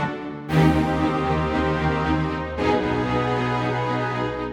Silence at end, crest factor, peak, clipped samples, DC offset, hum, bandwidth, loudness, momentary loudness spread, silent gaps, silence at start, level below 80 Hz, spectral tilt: 0 s; 16 dB; -6 dBFS; under 0.1%; under 0.1%; none; 12.5 kHz; -22 LUFS; 6 LU; none; 0 s; -38 dBFS; -7.5 dB/octave